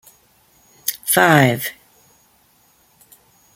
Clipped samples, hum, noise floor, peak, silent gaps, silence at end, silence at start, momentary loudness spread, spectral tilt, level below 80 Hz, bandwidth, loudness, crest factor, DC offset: under 0.1%; none; -57 dBFS; 0 dBFS; none; 1.85 s; 0.85 s; 13 LU; -4 dB/octave; -62 dBFS; 17 kHz; -16 LUFS; 22 dB; under 0.1%